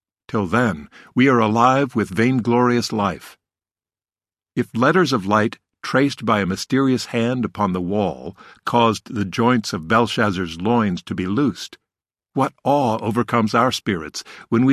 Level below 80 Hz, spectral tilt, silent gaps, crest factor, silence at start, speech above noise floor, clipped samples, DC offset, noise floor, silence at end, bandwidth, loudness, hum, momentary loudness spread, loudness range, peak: -50 dBFS; -6 dB/octave; none; 18 dB; 0.3 s; over 71 dB; under 0.1%; under 0.1%; under -90 dBFS; 0 s; 14 kHz; -19 LUFS; none; 10 LU; 3 LU; -2 dBFS